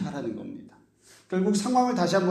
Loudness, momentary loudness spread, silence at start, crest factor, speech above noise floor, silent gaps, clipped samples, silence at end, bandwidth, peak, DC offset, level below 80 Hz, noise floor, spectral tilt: -26 LUFS; 17 LU; 0 s; 18 dB; 32 dB; none; under 0.1%; 0 s; 13.5 kHz; -10 dBFS; under 0.1%; -66 dBFS; -57 dBFS; -5.5 dB/octave